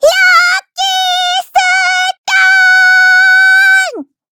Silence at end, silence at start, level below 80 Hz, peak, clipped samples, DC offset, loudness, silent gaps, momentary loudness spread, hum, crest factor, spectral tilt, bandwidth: 0.3 s; 0 s; -56 dBFS; 0 dBFS; 0.2%; under 0.1%; -7 LUFS; 2.18-2.24 s; 7 LU; none; 8 dB; 2.5 dB/octave; 20 kHz